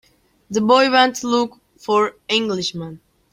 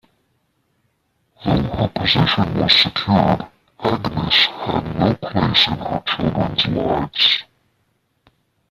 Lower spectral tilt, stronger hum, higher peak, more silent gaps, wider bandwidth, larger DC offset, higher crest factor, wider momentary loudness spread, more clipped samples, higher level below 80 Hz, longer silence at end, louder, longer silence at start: second, -3.5 dB/octave vs -6 dB/octave; neither; about the same, 0 dBFS vs -2 dBFS; neither; first, 16 kHz vs 14 kHz; neither; about the same, 18 dB vs 18 dB; first, 15 LU vs 9 LU; neither; second, -60 dBFS vs -42 dBFS; second, 0.35 s vs 1.3 s; about the same, -18 LUFS vs -17 LUFS; second, 0.5 s vs 1.4 s